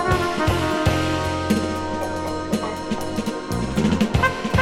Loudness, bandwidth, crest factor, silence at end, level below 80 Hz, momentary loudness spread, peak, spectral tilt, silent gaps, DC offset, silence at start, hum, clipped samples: -22 LUFS; 16.5 kHz; 18 dB; 0 s; -34 dBFS; 6 LU; -4 dBFS; -5.5 dB/octave; none; under 0.1%; 0 s; none; under 0.1%